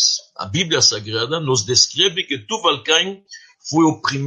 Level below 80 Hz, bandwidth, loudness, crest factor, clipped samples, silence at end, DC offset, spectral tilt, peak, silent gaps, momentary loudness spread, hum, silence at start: -60 dBFS; 10.5 kHz; -17 LUFS; 18 dB; under 0.1%; 0 s; under 0.1%; -2.5 dB/octave; 0 dBFS; none; 10 LU; none; 0 s